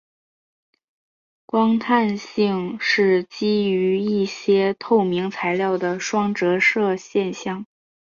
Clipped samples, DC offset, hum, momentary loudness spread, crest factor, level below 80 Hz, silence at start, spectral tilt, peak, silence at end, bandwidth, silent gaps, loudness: under 0.1%; under 0.1%; none; 6 LU; 16 dB; -66 dBFS; 1.55 s; -5.5 dB/octave; -6 dBFS; 0.45 s; 7.4 kHz; none; -20 LUFS